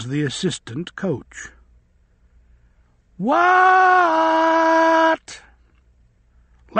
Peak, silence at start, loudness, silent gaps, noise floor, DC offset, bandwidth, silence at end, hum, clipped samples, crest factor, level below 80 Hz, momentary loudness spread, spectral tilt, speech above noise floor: -2 dBFS; 0 s; -17 LUFS; none; -57 dBFS; under 0.1%; 8.8 kHz; 0 s; none; under 0.1%; 18 dB; -56 dBFS; 19 LU; -5 dB/octave; 40 dB